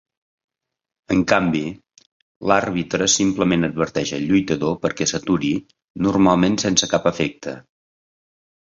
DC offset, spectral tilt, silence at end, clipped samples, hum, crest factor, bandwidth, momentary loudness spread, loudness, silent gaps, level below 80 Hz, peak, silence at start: under 0.1%; -4 dB/octave; 1.05 s; under 0.1%; none; 20 dB; 7.8 kHz; 8 LU; -19 LUFS; 2.06-2.41 s, 5.84-5.95 s; -48 dBFS; 0 dBFS; 1.1 s